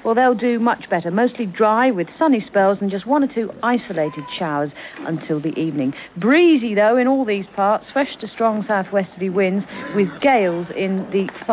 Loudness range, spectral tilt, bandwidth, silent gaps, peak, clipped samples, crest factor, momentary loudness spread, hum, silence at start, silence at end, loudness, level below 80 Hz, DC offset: 4 LU; -10.5 dB/octave; 4 kHz; none; -6 dBFS; under 0.1%; 14 dB; 9 LU; none; 0.05 s; 0 s; -19 LUFS; -62 dBFS; under 0.1%